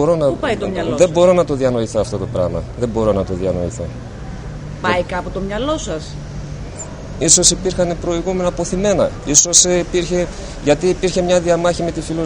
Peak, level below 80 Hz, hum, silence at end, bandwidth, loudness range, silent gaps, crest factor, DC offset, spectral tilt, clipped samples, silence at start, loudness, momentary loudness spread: 0 dBFS; -32 dBFS; none; 0 s; 11 kHz; 9 LU; none; 16 dB; under 0.1%; -3.5 dB/octave; under 0.1%; 0 s; -16 LUFS; 19 LU